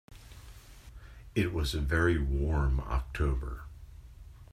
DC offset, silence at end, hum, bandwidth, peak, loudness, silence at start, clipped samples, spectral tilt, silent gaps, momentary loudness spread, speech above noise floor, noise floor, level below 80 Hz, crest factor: under 0.1%; 0.05 s; none; 15 kHz; -12 dBFS; -31 LUFS; 0.1 s; under 0.1%; -6.5 dB/octave; none; 24 LU; 21 dB; -50 dBFS; -36 dBFS; 20 dB